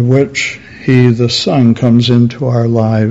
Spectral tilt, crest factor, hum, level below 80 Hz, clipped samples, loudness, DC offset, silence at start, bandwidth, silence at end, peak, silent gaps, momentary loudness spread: -6.5 dB/octave; 10 dB; none; -44 dBFS; 0.7%; -11 LUFS; under 0.1%; 0 s; 8 kHz; 0 s; 0 dBFS; none; 6 LU